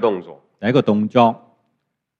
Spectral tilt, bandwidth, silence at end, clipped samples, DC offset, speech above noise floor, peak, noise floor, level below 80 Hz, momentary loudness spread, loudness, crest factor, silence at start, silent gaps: -8 dB/octave; 7 kHz; 0.85 s; under 0.1%; under 0.1%; 57 dB; 0 dBFS; -73 dBFS; -66 dBFS; 13 LU; -18 LUFS; 18 dB; 0 s; none